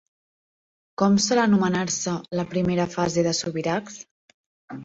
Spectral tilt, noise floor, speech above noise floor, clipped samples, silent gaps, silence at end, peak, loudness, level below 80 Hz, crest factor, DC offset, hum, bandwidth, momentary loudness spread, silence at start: -4.5 dB/octave; under -90 dBFS; over 67 dB; under 0.1%; 4.11-4.28 s, 4.34-4.68 s; 0 s; -8 dBFS; -23 LUFS; -58 dBFS; 18 dB; under 0.1%; none; 8 kHz; 17 LU; 1 s